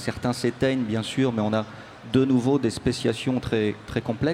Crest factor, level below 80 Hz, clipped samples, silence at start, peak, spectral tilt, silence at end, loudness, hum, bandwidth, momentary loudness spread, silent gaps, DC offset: 16 dB; -50 dBFS; under 0.1%; 0 s; -8 dBFS; -6 dB/octave; 0 s; -25 LUFS; none; 13 kHz; 7 LU; none; under 0.1%